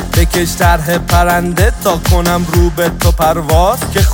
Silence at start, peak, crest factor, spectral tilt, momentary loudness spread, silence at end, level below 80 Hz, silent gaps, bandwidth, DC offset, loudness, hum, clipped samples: 0 s; 0 dBFS; 10 dB; -5 dB/octave; 2 LU; 0 s; -16 dBFS; none; 17 kHz; under 0.1%; -12 LUFS; none; under 0.1%